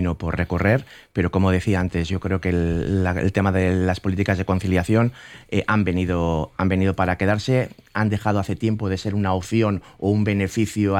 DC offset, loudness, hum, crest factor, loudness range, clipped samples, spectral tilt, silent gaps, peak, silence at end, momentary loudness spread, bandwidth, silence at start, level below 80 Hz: under 0.1%; -22 LUFS; none; 14 dB; 1 LU; under 0.1%; -7 dB/octave; none; -6 dBFS; 0 s; 5 LU; 13 kHz; 0 s; -40 dBFS